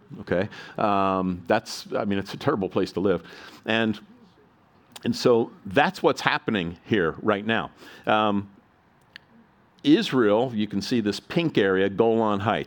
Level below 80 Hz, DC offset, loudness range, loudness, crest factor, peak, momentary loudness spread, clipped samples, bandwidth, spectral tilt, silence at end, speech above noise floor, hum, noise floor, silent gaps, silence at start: -60 dBFS; under 0.1%; 4 LU; -24 LUFS; 24 dB; -2 dBFS; 8 LU; under 0.1%; 18 kHz; -6 dB/octave; 0 s; 36 dB; none; -59 dBFS; none; 0.1 s